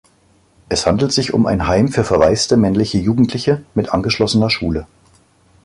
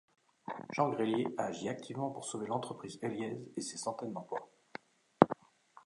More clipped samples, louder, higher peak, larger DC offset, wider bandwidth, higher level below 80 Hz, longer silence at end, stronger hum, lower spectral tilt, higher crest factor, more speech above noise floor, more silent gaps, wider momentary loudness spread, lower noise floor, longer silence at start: neither; first, -16 LUFS vs -37 LUFS; about the same, 0 dBFS vs -2 dBFS; neither; about the same, 11.5 kHz vs 11.5 kHz; first, -36 dBFS vs -78 dBFS; first, 0.8 s vs 0.05 s; neither; about the same, -5.5 dB/octave vs -5.5 dB/octave; second, 16 dB vs 34 dB; first, 39 dB vs 25 dB; neither; second, 5 LU vs 17 LU; second, -54 dBFS vs -63 dBFS; first, 0.7 s vs 0.45 s